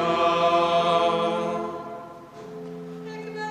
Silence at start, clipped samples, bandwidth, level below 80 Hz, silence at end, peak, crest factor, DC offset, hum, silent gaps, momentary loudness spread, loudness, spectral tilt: 0 s; under 0.1%; 10.5 kHz; -64 dBFS; 0 s; -8 dBFS; 16 dB; under 0.1%; none; none; 19 LU; -23 LUFS; -5 dB/octave